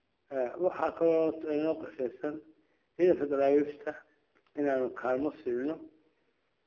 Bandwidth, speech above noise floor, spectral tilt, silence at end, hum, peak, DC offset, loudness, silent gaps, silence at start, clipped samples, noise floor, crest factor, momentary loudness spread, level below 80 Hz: 6.8 kHz; 45 dB; -8 dB/octave; 0.8 s; none; -14 dBFS; under 0.1%; -31 LUFS; none; 0.3 s; under 0.1%; -76 dBFS; 18 dB; 14 LU; -72 dBFS